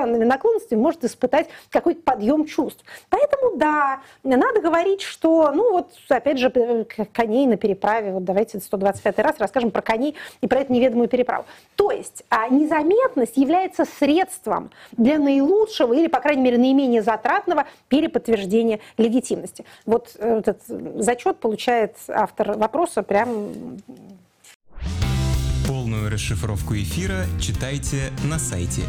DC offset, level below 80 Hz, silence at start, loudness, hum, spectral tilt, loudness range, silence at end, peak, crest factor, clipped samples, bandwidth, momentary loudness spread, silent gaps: under 0.1%; -38 dBFS; 0 s; -21 LUFS; none; -6 dB/octave; 6 LU; 0 s; -6 dBFS; 14 dB; under 0.1%; 16 kHz; 8 LU; 24.55-24.60 s